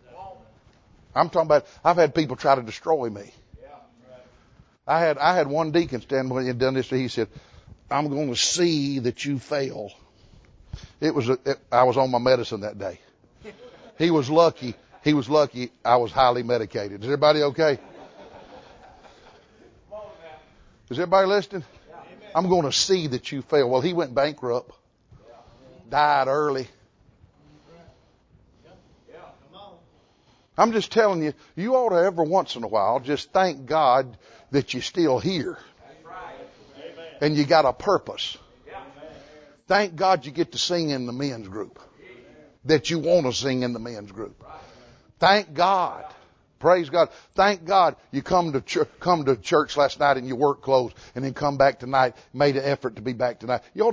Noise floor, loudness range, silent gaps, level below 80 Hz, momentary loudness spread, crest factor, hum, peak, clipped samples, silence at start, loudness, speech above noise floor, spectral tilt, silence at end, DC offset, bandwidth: -60 dBFS; 5 LU; none; -56 dBFS; 17 LU; 22 dB; none; -2 dBFS; under 0.1%; 0.15 s; -23 LUFS; 38 dB; -5 dB/octave; 0 s; under 0.1%; 8 kHz